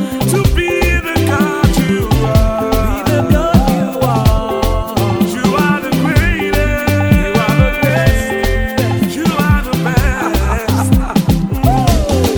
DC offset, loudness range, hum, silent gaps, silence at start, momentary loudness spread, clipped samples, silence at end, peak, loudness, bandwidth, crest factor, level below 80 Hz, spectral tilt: under 0.1%; 1 LU; none; none; 0 s; 3 LU; under 0.1%; 0 s; 0 dBFS; -13 LUFS; over 20 kHz; 12 dB; -20 dBFS; -6 dB/octave